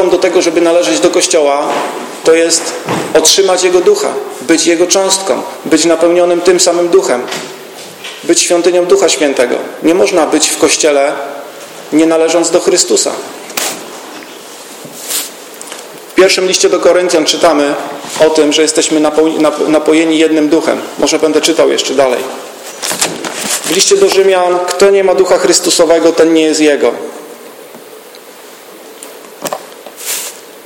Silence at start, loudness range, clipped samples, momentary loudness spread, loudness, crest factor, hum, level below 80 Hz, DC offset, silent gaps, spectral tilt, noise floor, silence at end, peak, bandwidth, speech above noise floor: 0 s; 5 LU; 0.2%; 18 LU; -10 LUFS; 10 dB; none; -52 dBFS; under 0.1%; none; -2 dB/octave; -33 dBFS; 0.05 s; 0 dBFS; over 20 kHz; 24 dB